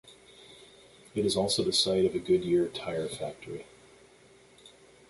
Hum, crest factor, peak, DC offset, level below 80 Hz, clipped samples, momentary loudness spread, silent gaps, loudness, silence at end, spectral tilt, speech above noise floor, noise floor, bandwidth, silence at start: none; 18 dB; -12 dBFS; under 0.1%; -60 dBFS; under 0.1%; 17 LU; none; -28 LUFS; 0.4 s; -4 dB/octave; 29 dB; -58 dBFS; 12 kHz; 0.05 s